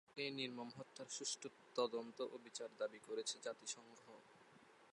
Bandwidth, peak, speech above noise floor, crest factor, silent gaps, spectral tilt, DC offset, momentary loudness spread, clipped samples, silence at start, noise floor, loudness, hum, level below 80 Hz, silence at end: 11.5 kHz; -28 dBFS; 20 dB; 22 dB; none; -2 dB/octave; under 0.1%; 20 LU; under 0.1%; 0.1 s; -68 dBFS; -47 LUFS; none; under -90 dBFS; 0 s